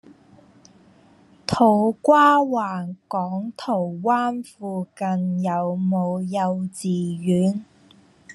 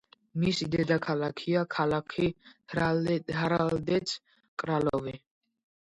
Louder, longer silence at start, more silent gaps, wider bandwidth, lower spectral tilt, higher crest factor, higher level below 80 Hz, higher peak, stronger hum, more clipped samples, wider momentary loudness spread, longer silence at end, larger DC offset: first, -22 LUFS vs -30 LUFS; first, 1.5 s vs 0.35 s; second, none vs 4.48-4.57 s; about the same, 12 kHz vs 11 kHz; about the same, -7 dB/octave vs -6 dB/octave; about the same, 20 dB vs 18 dB; about the same, -60 dBFS vs -58 dBFS; first, -4 dBFS vs -12 dBFS; neither; neither; about the same, 13 LU vs 11 LU; second, 0 s vs 0.75 s; neither